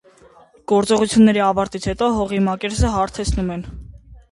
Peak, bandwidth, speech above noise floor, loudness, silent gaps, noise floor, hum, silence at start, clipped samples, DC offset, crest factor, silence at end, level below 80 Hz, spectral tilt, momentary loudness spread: -2 dBFS; 11.5 kHz; 32 dB; -18 LUFS; none; -49 dBFS; none; 0.7 s; under 0.1%; under 0.1%; 16 dB; 0.15 s; -32 dBFS; -5.5 dB/octave; 15 LU